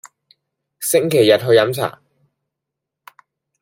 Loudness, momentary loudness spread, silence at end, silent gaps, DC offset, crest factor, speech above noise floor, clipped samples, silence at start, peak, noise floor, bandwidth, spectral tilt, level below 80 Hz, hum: -16 LUFS; 12 LU; 1.7 s; none; under 0.1%; 18 dB; 68 dB; under 0.1%; 0.8 s; -2 dBFS; -82 dBFS; 16.5 kHz; -4 dB/octave; -64 dBFS; none